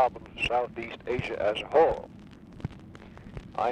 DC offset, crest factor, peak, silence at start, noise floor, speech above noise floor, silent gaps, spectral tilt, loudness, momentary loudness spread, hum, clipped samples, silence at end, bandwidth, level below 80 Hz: under 0.1%; 18 dB; -12 dBFS; 0 s; -47 dBFS; 19 dB; none; -6 dB/octave; -28 LUFS; 24 LU; none; under 0.1%; 0 s; 9.6 kHz; -50 dBFS